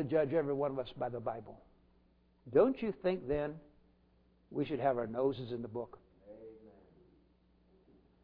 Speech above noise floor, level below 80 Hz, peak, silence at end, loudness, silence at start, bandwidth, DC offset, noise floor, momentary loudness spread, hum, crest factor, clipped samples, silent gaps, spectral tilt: 34 dB; -64 dBFS; -16 dBFS; 1.55 s; -36 LUFS; 0 s; 5.2 kHz; under 0.1%; -69 dBFS; 22 LU; none; 22 dB; under 0.1%; none; -6.5 dB/octave